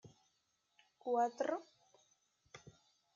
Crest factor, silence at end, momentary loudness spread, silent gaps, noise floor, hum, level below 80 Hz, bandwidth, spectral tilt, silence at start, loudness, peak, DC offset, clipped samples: 20 dB; 0.45 s; 23 LU; none; -82 dBFS; none; -88 dBFS; 7.4 kHz; -3.5 dB/octave; 0.05 s; -39 LUFS; -24 dBFS; under 0.1%; under 0.1%